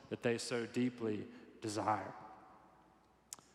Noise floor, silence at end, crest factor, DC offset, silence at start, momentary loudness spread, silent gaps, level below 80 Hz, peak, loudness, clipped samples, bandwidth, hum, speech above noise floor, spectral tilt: -68 dBFS; 0.2 s; 22 dB; under 0.1%; 0 s; 17 LU; none; -80 dBFS; -20 dBFS; -40 LUFS; under 0.1%; 14 kHz; none; 30 dB; -5 dB/octave